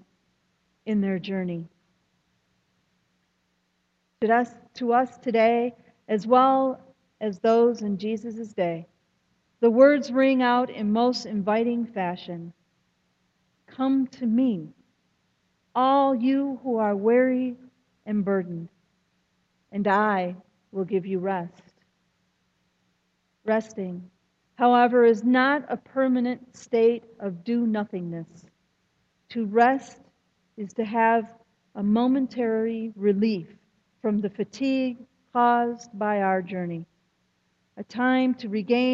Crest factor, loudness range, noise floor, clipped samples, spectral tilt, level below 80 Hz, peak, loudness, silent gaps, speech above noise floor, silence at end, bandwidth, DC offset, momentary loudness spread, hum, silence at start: 20 dB; 8 LU; -72 dBFS; under 0.1%; -7 dB/octave; -72 dBFS; -6 dBFS; -24 LUFS; none; 49 dB; 0 s; 7.6 kHz; under 0.1%; 16 LU; none; 0.85 s